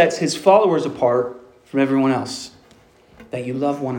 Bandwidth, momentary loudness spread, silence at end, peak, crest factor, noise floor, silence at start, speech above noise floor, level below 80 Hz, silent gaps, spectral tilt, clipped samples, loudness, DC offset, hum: 17 kHz; 15 LU; 0 s; -2 dBFS; 18 dB; -51 dBFS; 0 s; 33 dB; -62 dBFS; none; -5.5 dB/octave; under 0.1%; -19 LUFS; under 0.1%; none